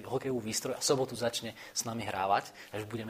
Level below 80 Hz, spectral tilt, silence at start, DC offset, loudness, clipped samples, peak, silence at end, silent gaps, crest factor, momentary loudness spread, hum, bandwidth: -68 dBFS; -3.5 dB/octave; 0 s; under 0.1%; -33 LUFS; under 0.1%; -14 dBFS; 0 s; none; 20 dB; 9 LU; none; 15.5 kHz